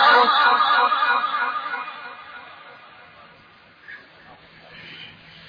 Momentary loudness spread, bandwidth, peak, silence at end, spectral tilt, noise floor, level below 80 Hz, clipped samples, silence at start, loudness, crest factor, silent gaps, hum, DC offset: 26 LU; 5.2 kHz; -4 dBFS; 0.4 s; -3 dB/octave; -50 dBFS; -70 dBFS; under 0.1%; 0 s; -18 LUFS; 18 dB; none; none; under 0.1%